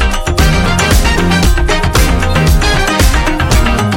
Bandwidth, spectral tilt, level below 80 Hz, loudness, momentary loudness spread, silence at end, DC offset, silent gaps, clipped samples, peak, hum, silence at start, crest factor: 17 kHz; -4.5 dB/octave; -12 dBFS; -11 LUFS; 2 LU; 0 s; under 0.1%; none; under 0.1%; 0 dBFS; none; 0 s; 10 dB